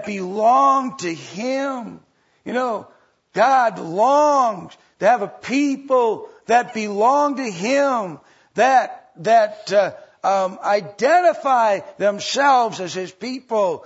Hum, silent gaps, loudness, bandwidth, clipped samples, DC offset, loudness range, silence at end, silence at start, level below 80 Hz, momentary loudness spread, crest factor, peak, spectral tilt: none; none; -19 LUFS; 8 kHz; under 0.1%; under 0.1%; 3 LU; 0.05 s; 0 s; -74 dBFS; 12 LU; 16 dB; -4 dBFS; -4 dB/octave